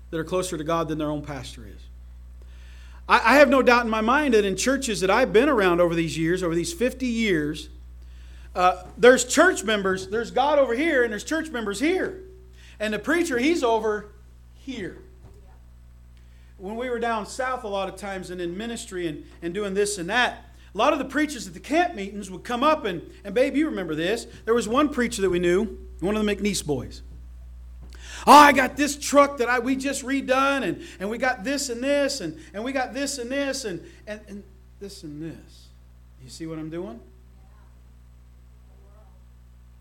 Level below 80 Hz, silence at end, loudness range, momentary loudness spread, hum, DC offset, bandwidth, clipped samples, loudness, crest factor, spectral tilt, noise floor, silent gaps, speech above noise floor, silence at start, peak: -46 dBFS; 2.8 s; 16 LU; 18 LU; 60 Hz at -45 dBFS; under 0.1%; 17.5 kHz; under 0.1%; -22 LUFS; 22 dB; -4 dB/octave; -49 dBFS; none; 26 dB; 0 s; -2 dBFS